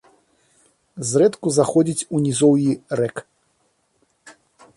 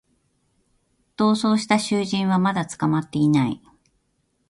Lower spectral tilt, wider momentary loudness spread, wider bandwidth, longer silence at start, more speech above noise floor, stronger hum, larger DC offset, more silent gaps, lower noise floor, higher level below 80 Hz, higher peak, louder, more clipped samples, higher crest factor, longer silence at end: about the same, -5.5 dB/octave vs -6 dB/octave; first, 9 LU vs 4 LU; about the same, 11.5 kHz vs 11.5 kHz; second, 0.95 s vs 1.2 s; about the same, 48 dB vs 49 dB; neither; neither; neither; about the same, -66 dBFS vs -69 dBFS; about the same, -64 dBFS vs -62 dBFS; about the same, -4 dBFS vs -4 dBFS; about the same, -19 LUFS vs -21 LUFS; neither; about the same, 18 dB vs 20 dB; second, 0.45 s vs 0.95 s